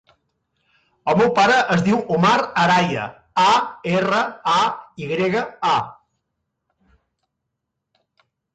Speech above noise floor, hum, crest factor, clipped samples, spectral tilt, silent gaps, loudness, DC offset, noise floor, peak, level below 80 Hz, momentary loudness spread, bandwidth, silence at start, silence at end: 61 dB; none; 16 dB; under 0.1%; -5 dB/octave; none; -18 LUFS; under 0.1%; -79 dBFS; -6 dBFS; -58 dBFS; 10 LU; 9.2 kHz; 1.05 s; 2.65 s